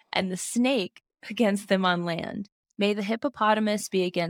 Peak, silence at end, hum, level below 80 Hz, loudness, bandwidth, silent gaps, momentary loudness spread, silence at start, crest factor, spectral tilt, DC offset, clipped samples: -8 dBFS; 0 s; none; -70 dBFS; -26 LUFS; 17.5 kHz; 2.52-2.63 s; 13 LU; 0.15 s; 18 dB; -4.5 dB/octave; under 0.1%; under 0.1%